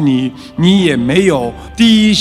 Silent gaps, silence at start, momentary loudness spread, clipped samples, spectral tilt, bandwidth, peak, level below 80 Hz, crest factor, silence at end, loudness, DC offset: none; 0 s; 10 LU; under 0.1%; -5.5 dB/octave; 12.5 kHz; 0 dBFS; -36 dBFS; 10 dB; 0 s; -11 LUFS; under 0.1%